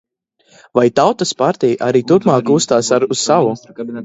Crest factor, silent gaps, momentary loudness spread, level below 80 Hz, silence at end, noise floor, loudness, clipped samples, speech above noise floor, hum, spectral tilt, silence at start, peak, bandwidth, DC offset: 14 dB; none; 6 LU; -58 dBFS; 0 s; -56 dBFS; -14 LUFS; under 0.1%; 42 dB; none; -5 dB/octave; 0.75 s; 0 dBFS; 8 kHz; under 0.1%